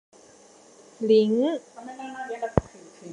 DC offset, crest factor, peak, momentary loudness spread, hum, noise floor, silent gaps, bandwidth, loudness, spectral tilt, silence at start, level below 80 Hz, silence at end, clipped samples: under 0.1%; 26 dB; 0 dBFS; 19 LU; none; -53 dBFS; none; 10.5 kHz; -25 LUFS; -7 dB/octave; 1 s; -48 dBFS; 0 s; under 0.1%